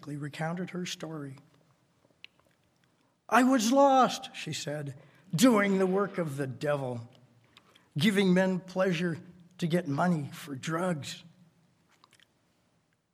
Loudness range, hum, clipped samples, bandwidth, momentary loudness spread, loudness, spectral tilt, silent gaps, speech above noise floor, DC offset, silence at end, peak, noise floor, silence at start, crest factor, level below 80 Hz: 8 LU; none; under 0.1%; 15.5 kHz; 17 LU; -29 LUFS; -5.5 dB/octave; none; 44 dB; under 0.1%; 1.85 s; -8 dBFS; -72 dBFS; 0 s; 22 dB; -78 dBFS